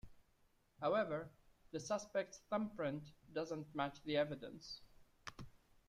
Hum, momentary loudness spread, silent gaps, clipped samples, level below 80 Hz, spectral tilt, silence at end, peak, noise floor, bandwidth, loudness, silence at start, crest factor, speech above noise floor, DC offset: none; 16 LU; none; under 0.1%; -70 dBFS; -5 dB/octave; 0.3 s; -26 dBFS; -75 dBFS; 13.5 kHz; -43 LUFS; 0.05 s; 18 dB; 33 dB; under 0.1%